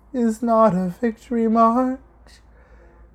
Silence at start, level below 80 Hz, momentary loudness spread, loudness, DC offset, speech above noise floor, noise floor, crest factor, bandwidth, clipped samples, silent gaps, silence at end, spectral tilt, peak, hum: 0.15 s; -50 dBFS; 9 LU; -19 LUFS; under 0.1%; 30 dB; -49 dBFS; 18 dB; 11.5 kHz; under 0.1%; none; 1.2 s; -8 dB/octave; -4 dBFS; none